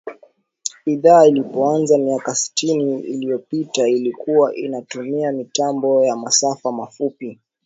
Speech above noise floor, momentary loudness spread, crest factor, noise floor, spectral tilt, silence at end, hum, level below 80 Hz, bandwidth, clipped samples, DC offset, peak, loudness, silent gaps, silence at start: 35 dB; 13 LU; 18 dB; -53 dBFS; -4 dB/octave; 0.3 s; none; -70 dBFS; 8 kHz; under 0.1%; under 0.1%; 0 dBFS; -18 LUFS; none; 0.05 s